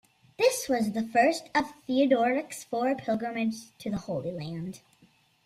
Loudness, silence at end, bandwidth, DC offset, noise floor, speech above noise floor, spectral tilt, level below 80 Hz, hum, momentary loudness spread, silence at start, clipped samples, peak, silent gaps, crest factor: -28 LUFS; 0.7 s; 15.5 kHz; under 0.1%; -63 dBFS; 35 dB; -4.5 dB/octave; -64 dBFS; none; 12 LU; 0.4 s; under 0.1%; -10 dBFS; none; 18 dB